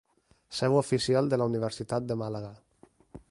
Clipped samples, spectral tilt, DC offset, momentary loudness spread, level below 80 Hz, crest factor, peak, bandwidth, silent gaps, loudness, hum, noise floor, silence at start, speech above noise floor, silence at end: under 0.1%; -6 dB/octave; under 0.1%; 13 LU; -62 dBFS; 18 dB; -12 dBFS; 11.5 kHz; none; -29 LUFS; none; -53 dBFS; 0.5 s; 25 dB; 0.1 s